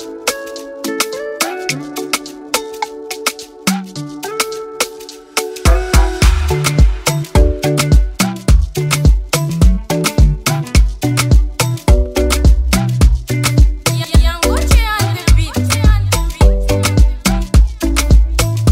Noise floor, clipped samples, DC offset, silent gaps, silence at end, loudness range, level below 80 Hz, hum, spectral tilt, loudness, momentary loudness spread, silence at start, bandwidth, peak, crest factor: -32 dBFS; under 0.1%; under 0.1%; none; 0 s; 6 LU; -14 dBFS; none; -4.5 dB/octave; -15 LUFS; 8 LU; 0 s; 16.5 kHz; 0 dBFS; 12 dB